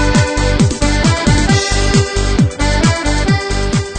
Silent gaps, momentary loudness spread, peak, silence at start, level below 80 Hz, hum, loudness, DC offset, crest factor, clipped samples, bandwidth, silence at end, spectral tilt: none; 3 LU; 0 dBFS; 0 s; -18 dBFS; none; -13 LUFS; under 0.1%; 12 dB; under 0.1%; 9.4 kHz; 0 s; -5 dB/octave